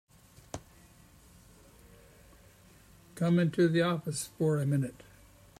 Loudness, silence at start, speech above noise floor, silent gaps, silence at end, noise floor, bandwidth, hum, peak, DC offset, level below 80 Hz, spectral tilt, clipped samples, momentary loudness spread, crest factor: -30 LUFS; 0.55 s; 30 dB; none; 0.7 s; -58 dBFS; 15.5 kHz; none; -16 dBFS; under 0.1%; -62 dBFS; -6.5 dB/octave; under 0.1%; 20 LU; 18 dB